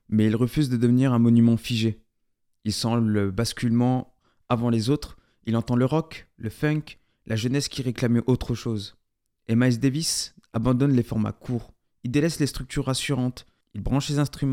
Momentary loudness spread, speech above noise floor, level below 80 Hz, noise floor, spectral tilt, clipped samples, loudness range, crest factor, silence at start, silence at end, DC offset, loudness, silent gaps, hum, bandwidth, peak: 13 LU; 48 dB; -46 dBFS; -71 dBFS; -6 dB/octave; under 0.1%; 4 LU; 18 dB; 0.1 s; 0 s; under 0.1%; -24 LUFS; none; none; 16 kHz; -6 dBFS